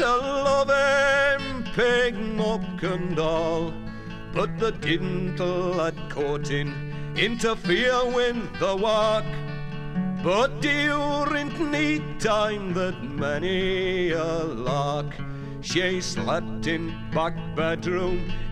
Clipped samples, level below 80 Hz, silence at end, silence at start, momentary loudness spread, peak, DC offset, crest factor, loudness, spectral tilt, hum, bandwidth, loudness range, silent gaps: under 0.1%; -38 dBFS; 0 s; 0 s; 9 LU; -8 dBFS; under 0.1%; 18 dB; -25 LUFS; -5 dB/octave; none; 12.5 kHz; 4 LU; none